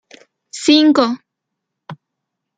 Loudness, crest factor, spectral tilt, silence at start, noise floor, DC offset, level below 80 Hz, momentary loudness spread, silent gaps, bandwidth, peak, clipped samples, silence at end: -13 LUFS; 16 dB; -3.5 dB/octave; 0.55 s; -78 dBFS; under 0.1%; -64 dBFS; 19 LU; none; 9.2 kHz; -2 dBFS; under 0.1%; 0.65 s